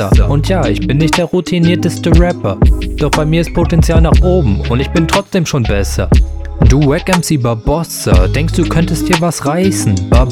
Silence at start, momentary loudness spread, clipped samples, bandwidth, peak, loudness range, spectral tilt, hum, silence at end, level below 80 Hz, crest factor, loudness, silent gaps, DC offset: 0 s; 4 LU; 0.3%; 16 kHz; 0 dBFS; 1 LU; -6 dB/octave; none; 0 s; -16 dBFS; 10 dB; -12 LUFS; none; 0.1%